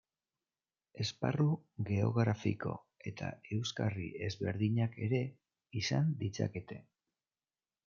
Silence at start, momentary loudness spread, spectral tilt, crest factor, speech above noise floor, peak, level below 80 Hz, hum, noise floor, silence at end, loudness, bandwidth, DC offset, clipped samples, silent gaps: 0.95 s; 11 LU; -6.5 dB/octave; 20 dB; over 55 dB; -16 dBFS; -72 dBFS; none; under -90 dBFS; 1.05 s; -36 LUFS; 7.4 kHz; under 0.1%; under 0.1%; none